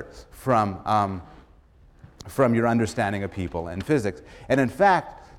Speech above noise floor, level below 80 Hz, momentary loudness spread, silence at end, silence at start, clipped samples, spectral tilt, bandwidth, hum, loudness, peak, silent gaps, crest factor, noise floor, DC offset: 30 dB; -50 dBFS; 13 LU; 0.15 s; 0 s; under 0.1%; -6.5 dB/octave; 16 kHz; none; -24 LUFS; -6 dBFS; none; 18 dB; -54 dBFS; under 0.1%